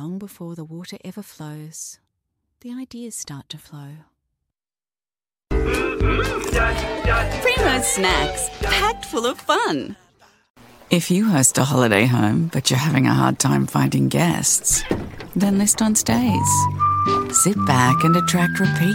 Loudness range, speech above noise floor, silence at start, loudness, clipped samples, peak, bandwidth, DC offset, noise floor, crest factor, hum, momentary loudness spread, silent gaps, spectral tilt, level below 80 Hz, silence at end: 17 LU; over 71 dB; 0 s; -18 LUFS; under 0.1%; 0 dBFS; 17 kHz; under 0.1%; under -90 dBFS; 20 dB; none; 18 LU; 10.50-10.54 s; -4 dB/octave; -34 dBFS; 0 s